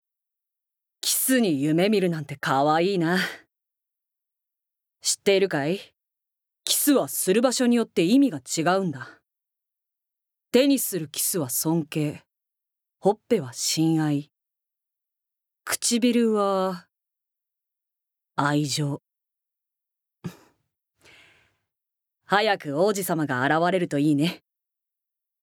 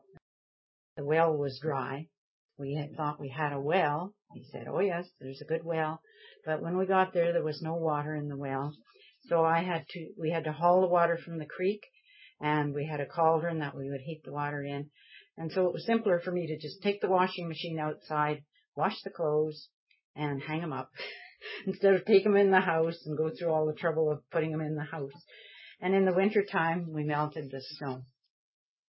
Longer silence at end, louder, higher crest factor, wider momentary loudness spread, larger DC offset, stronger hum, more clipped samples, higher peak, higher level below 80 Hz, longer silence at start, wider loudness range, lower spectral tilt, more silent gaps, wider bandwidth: first, 1.05 s vs 0.85 s; first, -23 LUFS vs -31 LUFS; about the same, 20 dB vs 22 dB; second, 11 LU vs 15 LU; neither; neither; neither; first, -4 dBFS vs -8 dBFS; about the same, -76 dBFS vs -78 dBFS; about the same, 1.05 s vs 0.95 s; first, 8 LU vs 5 LU; second, -4 dB/octave vs -10.5 dB/octave; second, none vs 2.18-2.49 s, 18.68-18.72 s, 19.74-19.87 s, 20.04-20.14 s; first, over 20 kHz vs 5.8 kHz